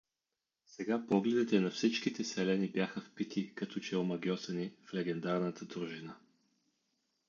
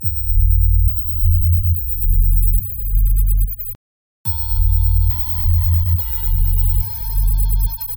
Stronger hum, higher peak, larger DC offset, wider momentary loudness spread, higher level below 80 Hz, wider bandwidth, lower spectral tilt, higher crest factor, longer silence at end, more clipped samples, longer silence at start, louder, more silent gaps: neither; second, -16 dBFS vs -4 dBFS; neither; first, 11 LU vs 5 LU; second, -80 dBFS vs -16 dBFS; second, 7.4 kHz vs 19.5 kHz; second, -5.5 dB/octave vs -7.5 dB/octave; first, 20 dB vs 12 dB; first, 1.1 s vs 0 s; neither; first, 0.7 s vs 0 s; second, -36 LUFS vs -17 LUFS; second, none vs 3.75-4.24 s